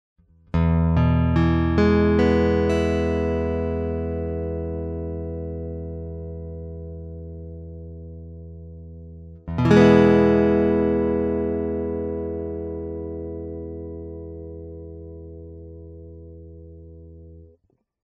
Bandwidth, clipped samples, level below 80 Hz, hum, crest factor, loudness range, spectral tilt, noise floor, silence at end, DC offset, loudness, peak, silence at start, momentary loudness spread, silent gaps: 7.8 kHz; under 0.1%; -36 dBFS; none; 22 dB; 19 LU; -8.5 dB/octave; -65 dBFS; 0.6 s; under 0.1%; -21 LUFS; -2 dBFS; 0.55 s; 23 LU; none